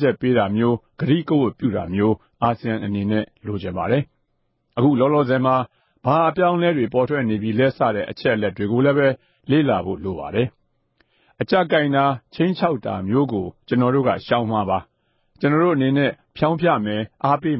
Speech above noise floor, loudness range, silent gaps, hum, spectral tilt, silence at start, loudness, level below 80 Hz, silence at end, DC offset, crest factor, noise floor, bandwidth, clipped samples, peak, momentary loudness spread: 50 dB; 3 LU; none; none; -12 dB/octave; 0 s; -20 LUFS; -50 dBFS; 0 s; under 0.1%; 16 dB; -69 dBFS; 5.8 kHz; under 0.1%; -4 dBFS; 8 LU